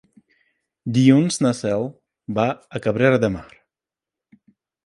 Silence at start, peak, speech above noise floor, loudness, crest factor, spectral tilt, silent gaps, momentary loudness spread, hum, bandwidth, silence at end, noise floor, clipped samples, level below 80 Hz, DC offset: 0.85 s; -2 dBFS; 70 dB; -20 LUFS; 20 dB; -6 dB/octave; none; 16 LU; none; 11.5 kHz; 1.4 s; -89 dBFS; under 0.1%; -54 dBFS; under 0.1%